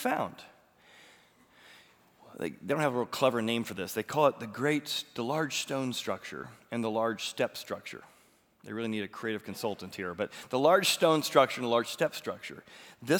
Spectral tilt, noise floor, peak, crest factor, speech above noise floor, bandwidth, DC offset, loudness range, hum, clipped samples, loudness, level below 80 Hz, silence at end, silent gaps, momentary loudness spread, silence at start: -4 dB/octave; -64 dBFS; -8 dBFS; 24 dB; 34 dB; over 20 kHz; under 0.1%; 7 LU; none; under 0.1%; -31 LUFS; -78 dBFS; 0 s; none; 17 LU; 0 s